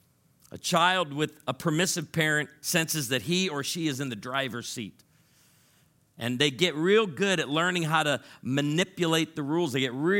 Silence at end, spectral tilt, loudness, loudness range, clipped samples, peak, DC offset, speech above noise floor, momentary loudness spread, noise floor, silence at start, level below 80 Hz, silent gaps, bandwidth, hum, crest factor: 0 s; -4 dB/octave; -27 LUFS; 5 LU; under 0.1%; -8 dBFS; under 0.1%; 37 dB; 9 LU; -64 dBFS; 0.55 s; -70 dBFS; none; 17 kHz; none; 20 dB